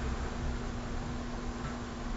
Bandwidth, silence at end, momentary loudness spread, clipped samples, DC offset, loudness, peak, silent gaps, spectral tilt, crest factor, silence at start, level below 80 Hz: 7.6 kHz; 0 s; 2 LU; under 0.1%; under 0.1%; -39 LUFS; -24 dBFS; none; -5.5 dB/octave; 12 dB; 0 s; -40 dBFS